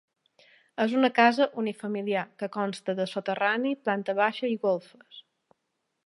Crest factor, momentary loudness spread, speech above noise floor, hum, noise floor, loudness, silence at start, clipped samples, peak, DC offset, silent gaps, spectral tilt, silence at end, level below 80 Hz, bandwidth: 22 dB; 10 LU; 53 dB; none; -80 dBFS; -27 LUFS; 0.8 s; under 0.1%; -6 dBFS; under 0.1%; none; -5.5 dB/octave; 0.85 s; -84 dBFS; 11.5 kHz